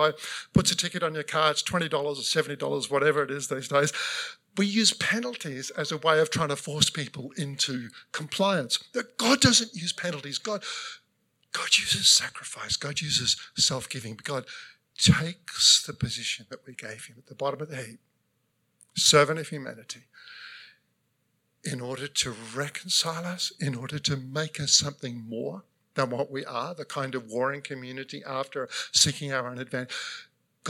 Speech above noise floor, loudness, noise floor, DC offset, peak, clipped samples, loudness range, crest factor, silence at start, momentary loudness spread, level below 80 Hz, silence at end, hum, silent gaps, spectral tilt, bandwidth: 46 dB; -26 LUFS; -74 dBFS; under 0.1%; -4 dBFS; under 0.1%; 7 LU; 24 dB; 0 s; 17 LU; -60 dBFS; 0 s; none; none; -2.5 dB/octave; 17 kHz